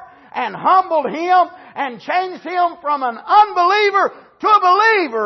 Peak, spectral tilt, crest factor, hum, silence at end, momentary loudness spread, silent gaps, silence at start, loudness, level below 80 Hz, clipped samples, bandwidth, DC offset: -2 dBFS; -4 dB/octave; 14 dB; none; 0 s; 12 LU; none; 0 s; -16 LUFS; -66 dBFS; under 0.1%; 6.2 kHz; under 0.1%